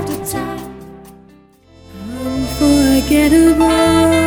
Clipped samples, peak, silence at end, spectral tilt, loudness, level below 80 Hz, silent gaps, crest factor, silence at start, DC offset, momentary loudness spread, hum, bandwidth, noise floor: under 0.1%; 0 dBFS; 0 s; -5 dB/octave; -13 LUFS; -30 dBFS; none; 14 dB; 0 s; under 0.1%; 19 LU; none; over 20 kHz; -46 dBFS